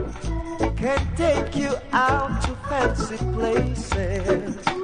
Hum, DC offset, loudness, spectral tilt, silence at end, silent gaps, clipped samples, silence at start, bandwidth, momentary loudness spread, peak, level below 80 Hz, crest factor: none; under 0.1%; -24 LUFS; -6 dB/octave; 0 s; none; under 0.1%; 0 s; 10.5 kHz; 5 LU; -6 dBFS; -30 dBFS; 16 dB